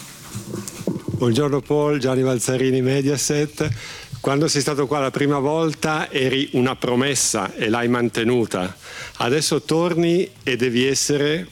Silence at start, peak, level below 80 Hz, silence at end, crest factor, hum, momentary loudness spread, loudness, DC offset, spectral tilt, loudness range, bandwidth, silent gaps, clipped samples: 0 s; -4 dBFS; -52 dBFS; 0.05 s; 16 dB; none; 9 LU; -20 LUFS; under 0.1%; -4.5 dB/octave; 1 LU; 17.5 kHz; none; under 0.1%